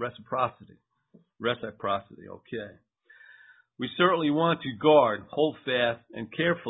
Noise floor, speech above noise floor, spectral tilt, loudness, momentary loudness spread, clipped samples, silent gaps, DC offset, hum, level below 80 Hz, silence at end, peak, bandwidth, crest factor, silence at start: -62 dBFS; 35 dB; -9.5 dB/octave; -27 LUFS; 17 LU; under 0.1%; none; under 0.1%; none; -66 dBFS; 0 s; -6 dBFS; 4 kHz; 22 dB; 0 s